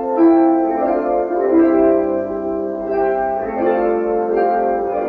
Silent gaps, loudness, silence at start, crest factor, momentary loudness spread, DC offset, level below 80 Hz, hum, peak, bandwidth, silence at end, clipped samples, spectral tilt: none; -16 LUFS; 0 s; 12 dB; 8 LU; under 0.1%; -48 dBFS; none; -4 dBFS; 4.2 kHz; 0 s; under 0.1%; -7 dB/octave